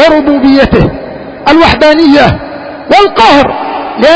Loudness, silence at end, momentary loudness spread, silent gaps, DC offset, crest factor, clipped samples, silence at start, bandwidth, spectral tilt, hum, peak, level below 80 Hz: -6 LUFS; 0 s; 14 LU; none; under 0.1%; 6 dB; 6%; 0 s; 8 kHz; -6 dB/octave; none; 0 dBFS; -26 dBFS